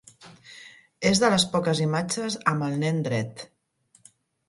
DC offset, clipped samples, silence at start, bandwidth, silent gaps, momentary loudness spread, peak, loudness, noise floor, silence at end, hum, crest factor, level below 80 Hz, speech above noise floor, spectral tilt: under 0.1%; under 0.1%; 0.2 s; 11.5 kHz; none; 24 LU; -6 dBFS; -24 LUFS; -64 dBFS; 1.05 s; none; 20 dB; -60 dBFS; 40 dB; -4.5 dB/octave